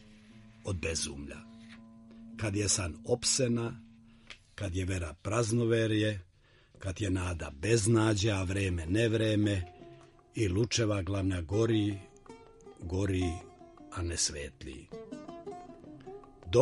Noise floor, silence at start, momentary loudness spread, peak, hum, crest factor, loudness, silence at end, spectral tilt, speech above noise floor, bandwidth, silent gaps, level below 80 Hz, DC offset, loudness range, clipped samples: -61 dBFS; 0.1 s; 21 LU; -12 dBFS; none; 20 dB; -31 LUFS; 0 s; -5 dB/octave; 30 dB; 11.5 kHz; none; -52 dBFS; under 0.1%; 6 LU; under 0.1%